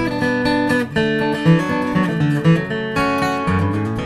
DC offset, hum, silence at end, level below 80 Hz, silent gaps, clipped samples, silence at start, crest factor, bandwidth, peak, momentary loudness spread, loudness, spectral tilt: 0.1%; none; 0 s; -42 dBFS; none; under 0.1%; 0 s; 16 dB; 13.5 kHz; -2 dBFS; 3 LU; -18 LUFS; -7 dB/octave